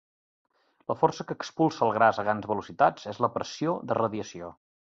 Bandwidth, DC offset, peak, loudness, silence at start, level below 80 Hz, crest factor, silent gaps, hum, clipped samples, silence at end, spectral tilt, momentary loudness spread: 7.8 kHz; under 0.1%; -6 dBFS; -27 LUFS; 0.9 s; -66 dBFS; 22 dB; none; none; under 0.1%; 0.35 s; -6 dB/octave; 13 LU